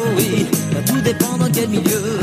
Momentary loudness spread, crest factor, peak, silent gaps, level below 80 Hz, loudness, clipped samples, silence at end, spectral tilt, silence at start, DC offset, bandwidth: 1 LU; 16 dB; 0 dBFS; none; -48 dBFS; -17 LUFS; under 0.1%; 0 s; -5 dB/octave; 0 s; under 0.1%; 15.5 kHz